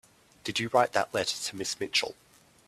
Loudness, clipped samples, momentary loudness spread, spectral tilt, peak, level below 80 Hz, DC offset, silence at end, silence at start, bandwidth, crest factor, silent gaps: -29 LUFS; under 0.1%; 8 LU; -2.5 dB/octave; -8 dBFS; -68 dBFS; under 0.1%; 0.55 s; 0.45 s; 15 kHz; 22 dB; none